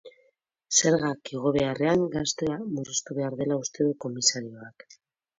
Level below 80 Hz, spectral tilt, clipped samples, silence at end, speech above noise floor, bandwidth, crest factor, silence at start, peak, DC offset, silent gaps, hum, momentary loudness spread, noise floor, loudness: -60 dBFS; -3.5 dB/octave; under 0.1%; 0.7 s; 42 dB; 7.8 kHz; 20 dB; 0.05 s; -8 dBFS; under 0.1%; none; none; 10 LU; -69 dBFS; -26 LUFS